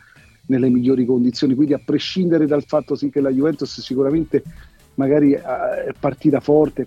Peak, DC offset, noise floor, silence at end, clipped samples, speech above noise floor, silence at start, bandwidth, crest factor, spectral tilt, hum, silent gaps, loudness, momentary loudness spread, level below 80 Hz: -4 dBFS; under 0.1%; -39 dBFS; 0 s; under 0.1%; 21 dB; 0.5 s; 7.6 kHz; 14 dB; -7.5 dB/octave; none; none; -18 LUFS; 7 LU; -50 dBFS